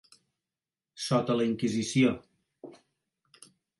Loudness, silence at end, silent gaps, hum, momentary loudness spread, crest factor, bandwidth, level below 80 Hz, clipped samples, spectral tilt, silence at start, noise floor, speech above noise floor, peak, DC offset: -28 LUFS; 1.1 s; none; none; 25 LU; 18 dB; 11.5 kHz; -68 dBFS; under 0.1%; -5.5 dB/octave; 0.95 s; under -90 dBFS; over 63 dB; -12 dBFS; under 0.1%